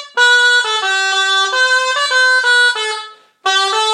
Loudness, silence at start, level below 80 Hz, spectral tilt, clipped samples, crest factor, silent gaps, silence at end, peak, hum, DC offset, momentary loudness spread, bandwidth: -12 LUFS; 0 s; -80 dBFS; 4.5 dB/octave; under 0.1%; 12 dB; none; 0 s; -2 dBFS; none; under 0.1%; 8 LU; 13.5 kHz